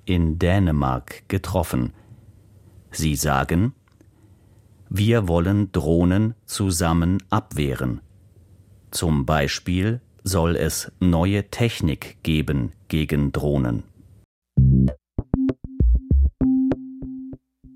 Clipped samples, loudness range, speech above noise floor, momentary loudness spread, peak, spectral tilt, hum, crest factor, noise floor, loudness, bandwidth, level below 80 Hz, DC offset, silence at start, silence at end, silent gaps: under 0.1%; 3 LU; 32 dB; 9 LU; -4 dBFS; -6 dB/octave; none; 18 dB; -53 dBFS; -22 LUFS; 16 kHz; -30 dBFS; under 0.1%; 0.05 s; 0.4 s; 14.25-14.42 s